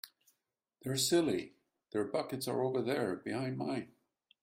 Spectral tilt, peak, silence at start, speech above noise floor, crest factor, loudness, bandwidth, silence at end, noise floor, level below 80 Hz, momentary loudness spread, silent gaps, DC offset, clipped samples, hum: -4.5 dB/octave; -18 dBFS; 0.05 s; 51 dB; 20 dB; -35 LUFS; 16 kHz; 0.55 s; -86 dBFS; -76 dBFS; 15 LU; none; under 0.1%; under 0.1%; none